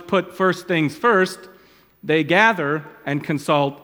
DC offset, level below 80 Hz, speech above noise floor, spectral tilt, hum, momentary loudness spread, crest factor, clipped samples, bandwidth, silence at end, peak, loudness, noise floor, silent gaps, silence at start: under 0.1%; -66 dBFS; 31 dB; -5.5 dB/octave; none; 11 LU; 20 dB; under 0.1%; 19 kHz; 0.05 s; 0 dBFS; -19 LUFS; -51 dBFS; none; 0 s